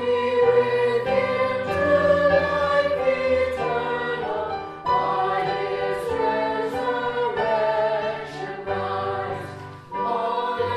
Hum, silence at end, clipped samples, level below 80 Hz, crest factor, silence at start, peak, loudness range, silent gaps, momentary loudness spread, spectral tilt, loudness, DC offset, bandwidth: none; 0 s; under 0.1%; -54 dBFS; 16 dB; 0 s; -6 dBFS; 5 LU; none; 10 LU; -6 dB/octave; -23 LUFS; under 0.1%; 12 kHz